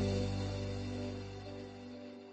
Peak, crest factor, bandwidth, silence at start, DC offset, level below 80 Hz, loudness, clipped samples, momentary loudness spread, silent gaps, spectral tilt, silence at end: -24 dBFS; 16 dB; 8.4 kHz; 0 s; under 0.1%; -52 dBFS; -41 LUFS; under 0.1%; 12 LU; none; -6.5 dB/octave; 0 s